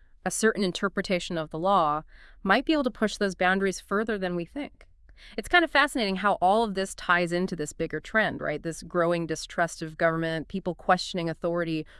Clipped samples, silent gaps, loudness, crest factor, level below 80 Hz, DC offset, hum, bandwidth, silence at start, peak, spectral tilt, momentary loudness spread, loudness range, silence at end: under 0.1%; none; -27 LUFS; 20 dB; -52 dBFS; under 0.1%; none; 12 kHz; 0.25 s; -6 dBFS; -4.5 dB/octave; 9 LU; 3 LU; 0.15 s